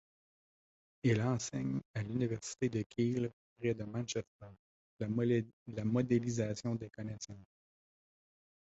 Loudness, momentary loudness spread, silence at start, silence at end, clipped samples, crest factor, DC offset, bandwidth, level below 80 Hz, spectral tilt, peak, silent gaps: -37 LUFS; 12 LU; 1.05 s; 1.3 s; under 0.1%; 18 dB; under 0.1%; 8 kHz; -66 dBFS; -7.5 dB/octave; -18 dBFS; 1.85-1.94 s, 2.86-2.90 s, 3.33-3.56 s, 4.27-4.39 s, 4.59-4.97 s, 5.53-5.66 s